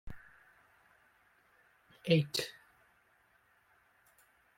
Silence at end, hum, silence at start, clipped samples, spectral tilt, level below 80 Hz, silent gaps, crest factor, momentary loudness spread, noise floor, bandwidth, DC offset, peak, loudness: 2.05 s; none; 0.05 s; under 0.1%; -5.5 dB/octave; -64 dBFS; none; 26 dB; 26 LU; -70 dBFS; 16.5 kHz; under 0.1%; -16 dBFS; -34 LUFS